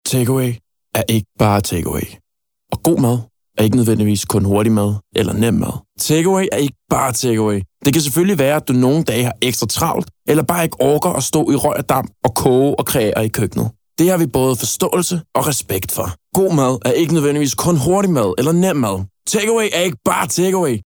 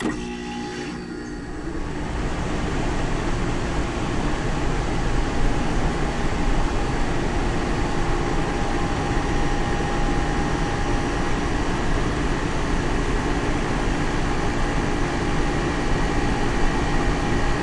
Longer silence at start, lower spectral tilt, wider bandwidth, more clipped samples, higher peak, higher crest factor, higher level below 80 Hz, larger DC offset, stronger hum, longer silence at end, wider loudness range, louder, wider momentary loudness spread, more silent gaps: about the same, 0.05 s vs 0 s; about the same, -5 dB/octave vs -5.5 dB/octave; first, over 20 kHz vs 11 kHz; neither; first, 0 dBFS vs -8 dBFS; about the same, 14 dB vs 14 dB; second, -44 dBFS vs -26 dBFS; neither; neither; about the same, 0.05 s vs 0 s; about the same, 2 LU vs 3 LU; first, -16 LUFS vs -25 LUFS; about the same, 6 LU vs 5 LU; neither